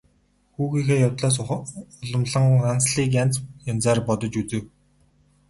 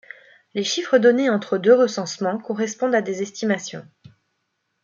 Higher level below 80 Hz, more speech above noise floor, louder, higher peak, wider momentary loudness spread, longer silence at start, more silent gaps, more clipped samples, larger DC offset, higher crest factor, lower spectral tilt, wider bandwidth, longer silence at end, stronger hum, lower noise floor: first, -52 dBFS vs -72 dBFS; second, 41 dB vs 54 dB; about the same, -22 LUFS vs -20 LUFS; second, -6 dBFS vs -2 dBFS; about the same, 11 LU vs 11 LU; about the same, 0.6 s vs 0.55 s; neither; neither; neither; about the same, 16 dB vs 18 dB; about the same, -5.5 dB/octave vs -4.5 dB/octave; first, 11.5 kHz vs 7.4 kHz; second, 0.8 s vs 1 s; neither; second, -63 dBFS vs -74 dBFS